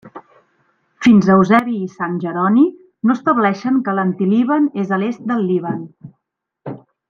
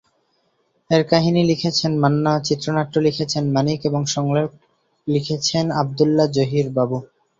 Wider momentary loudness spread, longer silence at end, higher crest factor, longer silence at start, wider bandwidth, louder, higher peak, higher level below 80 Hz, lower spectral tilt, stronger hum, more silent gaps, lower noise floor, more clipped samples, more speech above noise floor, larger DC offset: first, 15 LU vs 5 LU; about the same, 0.3 s vs 0.35 s; about the same, 16 dB vs 18 dB; second, 0.05 s vs 0.9 s; about the same, 7.2 kHz vs 7.8 kHz; first, -16 LUFS vs -19 LUFS; about the same, -2 dBFS vs -2 dBFS; second, -60 dBFS vs -54 dBFS; first, -8 dB/octave vs -5.5 dB/octave; neither; neither; first, -76 dBFS vs -66 dBFS; neither; first, 61 dB vs 47 dB; neither